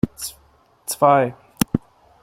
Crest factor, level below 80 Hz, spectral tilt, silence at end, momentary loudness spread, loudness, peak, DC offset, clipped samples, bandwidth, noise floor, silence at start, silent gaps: 22 dB; -46 dBFS; -5 dB/octave; 0.45 s; 16 LU; -20 LUFS; 0 dBFS; under 0.1%; under 0.1%; 16.5 kHz; -56 dBFS; 0.05 s; none